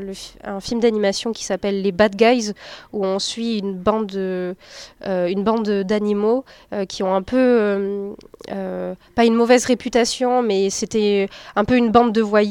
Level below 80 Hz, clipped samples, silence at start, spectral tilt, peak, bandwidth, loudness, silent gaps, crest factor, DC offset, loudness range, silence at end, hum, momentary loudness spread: -50 dBFS; under 0.1%; 0 s; -4.5 dB/octave; 0 dBFS; 13 kHz; -19 LUFS; none; 18 dB; under 0.1%; 4 LU; 0 s; none; 14 LU